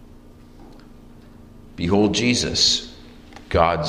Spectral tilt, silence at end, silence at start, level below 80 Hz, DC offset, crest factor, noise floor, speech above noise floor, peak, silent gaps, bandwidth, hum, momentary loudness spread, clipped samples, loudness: -3.5 dB/octave; 0 s; 0.3 s; -42 dBFS; under 0.1%; 20 dB; -45 dBFS; 26 dB; -2 dBFS; none; 13 kHz; none; 10 LU; under 0.1%; -19 LUFS